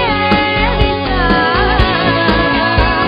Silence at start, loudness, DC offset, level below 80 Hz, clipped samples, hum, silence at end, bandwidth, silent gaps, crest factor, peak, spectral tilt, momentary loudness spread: 0 s; -12 LUFS; under 0.1%; -20 dBFS; under 0.1%; none; 0 s; 5.4 kHz; none; 12 dB; 0 dBFS; -7.5 dB/octave; 2 LU